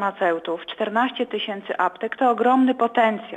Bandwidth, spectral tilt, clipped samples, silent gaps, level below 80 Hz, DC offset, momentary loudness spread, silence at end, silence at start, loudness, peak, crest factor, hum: 9.2 kHz; -6 dB/octave; under 0.1%; none; -72 dBFS; under 0.1%; 9 LU; 0 s; 0 s; -22 LUFS; -6 dBFS; 16 dB; none